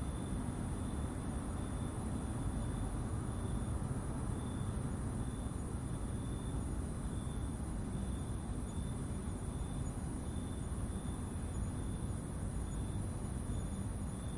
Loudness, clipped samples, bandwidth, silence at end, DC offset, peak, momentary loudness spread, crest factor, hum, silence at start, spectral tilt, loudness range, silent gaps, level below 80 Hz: -41 LUFS; under 0.1%; 11.5 kHz; 0 s; under 0.1%; -26 dBFS; 2 LU; 12 dB; none; 0 s; -6.5 dB/octave; 1 LU; none; -44 dBFS